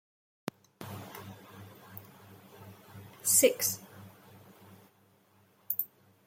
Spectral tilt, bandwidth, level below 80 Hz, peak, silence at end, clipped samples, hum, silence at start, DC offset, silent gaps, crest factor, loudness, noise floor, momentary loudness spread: -2 dB/octave; 16.5 kHz; -78 dBFS; -12 dBFS; 0.4 s; under 0.1%; none; 0.8 s; under 0.1%; none; 26 dB; -28 LUFS; -66 dBFS; 29 LU